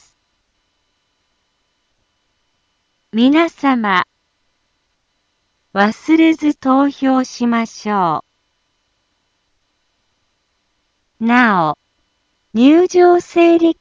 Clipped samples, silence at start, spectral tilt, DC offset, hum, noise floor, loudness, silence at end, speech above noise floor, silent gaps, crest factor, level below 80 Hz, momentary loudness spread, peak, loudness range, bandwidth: under 0.1%; 3.15 s; -5.5 dB/octave; under 0.1%; none; -66 dBFS; -14 LUFS; 0.1 s; 54 dB; none; 16 dB; -62 dBFS; 11 LU; 0 dBFS; 8 LU; 7.6 kHz